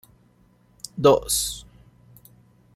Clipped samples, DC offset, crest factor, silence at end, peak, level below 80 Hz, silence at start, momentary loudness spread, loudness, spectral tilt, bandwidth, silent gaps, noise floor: under 0.1%; under 0.1%; 24 dB; 1.15 s; -4 dBFS; -50 dBFS; 0.95 s; 20 LU; -21 LUFS; -3.5 dB/octave; 16 kHz; none; -59 dBFS